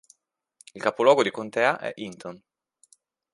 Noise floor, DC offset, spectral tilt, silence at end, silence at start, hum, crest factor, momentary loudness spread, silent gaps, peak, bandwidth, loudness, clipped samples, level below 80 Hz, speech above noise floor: -62 dBFS; under 0.1%; -4 dB/octave; 0.95 s; 0.75 s; none; 22 dB; 18 LU; none; -4 dBFS; 11.5 kHz; -23 LUFS; under 0.1%; -76 dBFS; 38 dB